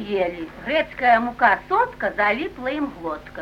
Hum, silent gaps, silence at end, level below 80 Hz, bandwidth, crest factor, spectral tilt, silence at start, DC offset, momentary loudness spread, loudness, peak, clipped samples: none; none; 0 s; -48 dBFS; 12.5 kHz; 18 dB; -6 dB/octave; 0 s; under 0.1%; 10 LU; -21 LUFS; -2 dBFS; under 0.1%